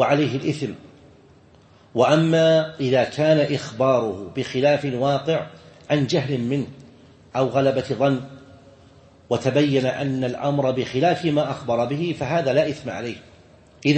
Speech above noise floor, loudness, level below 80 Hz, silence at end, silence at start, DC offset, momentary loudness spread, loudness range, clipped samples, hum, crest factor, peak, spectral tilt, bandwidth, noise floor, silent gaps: 31 dB; -22 LUFS; -58 dBFS; 0 s; 0 s; under 0.1%; 11 LU; 4 LU; under 0.1%; none; 18 dB; -4 dBFS; -6.5 dB/octave; 8.8 kHz; -52 dBFS; none